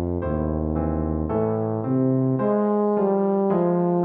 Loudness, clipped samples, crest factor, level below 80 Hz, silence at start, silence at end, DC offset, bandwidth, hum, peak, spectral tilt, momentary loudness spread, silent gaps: -22 LUFS; under 0.1%; 12 dB; -36 dBFS; 0 s; 0 s; under 0.1%; 3.4 kHz; none; -10 dBFS; -13.5 dB/octave; 4 LU; none